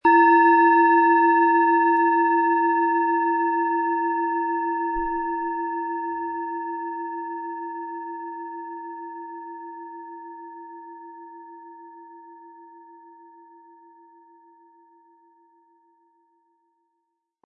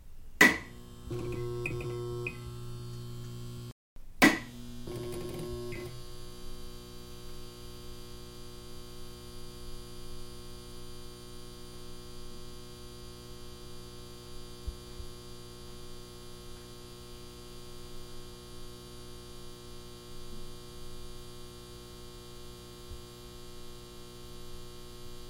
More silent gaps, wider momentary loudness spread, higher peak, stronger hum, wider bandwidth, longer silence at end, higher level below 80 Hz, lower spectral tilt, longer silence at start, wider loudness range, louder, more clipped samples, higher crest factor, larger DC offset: second, none vs 3.72-3.96 s; first, 25 LU vs 11 LU; about the same, -6 dBFS vs -6 dBFS; second, none vs 60 Hz at -55 dBFS; second, 5.4 kHz vs 16.5 kHz; first, 4.8 s vs 0 s; second, -58 dBFS vs -48 dBFS; first, -7 dB/octave vs -4 dB/octave; about the same, 0.05 s vs 0 s; first, 24 LU vs 15 LU; first, -21 LUFS vs -35 LUFS; neither; second, 18 dB vs 32 dB; neither